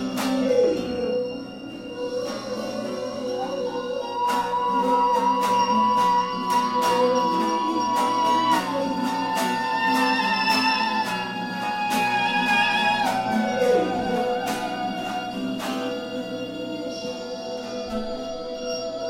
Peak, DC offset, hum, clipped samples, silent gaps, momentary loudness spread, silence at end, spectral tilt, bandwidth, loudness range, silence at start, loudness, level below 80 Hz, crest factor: -8 dBFS; under 0.1%; none; under 0.1%; none; 11 LU; 0 s; -4 dB/octave; 16 kHz; 8 LU; 0 s; -23 LUFS; -56 dBFS; 16 dB